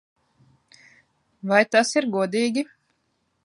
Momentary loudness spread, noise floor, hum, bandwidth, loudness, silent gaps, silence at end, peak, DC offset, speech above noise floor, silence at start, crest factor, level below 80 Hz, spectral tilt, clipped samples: 14 LU; -72 dBFS; none; 11.5 kHz; -21 LUFS; none; 0.8 s; -4 dBFS; under 0.1%; 51 dB; 1.45 s; 22 dB; -76 dBFS; -4 dB/octave; under 0.1%